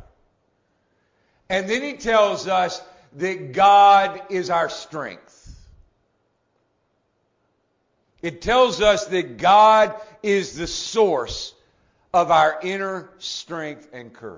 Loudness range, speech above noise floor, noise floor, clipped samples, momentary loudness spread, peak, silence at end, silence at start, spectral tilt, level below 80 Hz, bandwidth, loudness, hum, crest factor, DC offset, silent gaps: 11 LU; 50 dB; -69 dBFS; under 0.1%; 18 LU; -4 dBFS; 0 s; 1.5 s; -3.5 dB/octave; -50 dBFS; 7.6 kHz; -19 LUFS; none; 18 dB; under 0.1%; none